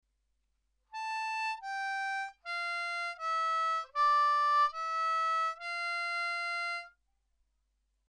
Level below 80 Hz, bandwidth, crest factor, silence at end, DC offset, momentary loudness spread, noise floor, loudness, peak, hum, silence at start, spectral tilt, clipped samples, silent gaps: -78 dBFS; 10.5 kHz; 14 dB; 1.2 s; under 0.1%; 10 LU; -78 dBFS; -32 LUFS; -20 dBFS; none; 0.95 s; 3 dB/octave; under 0.1%; none